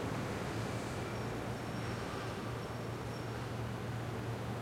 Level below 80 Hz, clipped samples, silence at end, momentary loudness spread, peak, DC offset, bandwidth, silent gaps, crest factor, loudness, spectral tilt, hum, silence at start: -56 dBFS; under 0.1%; 0 s; 2 LU; -26 dBFS; under 0.1%; 16 kHz; none; 14 dB; -40 LUFS; -6 dB/octave; none; 0 s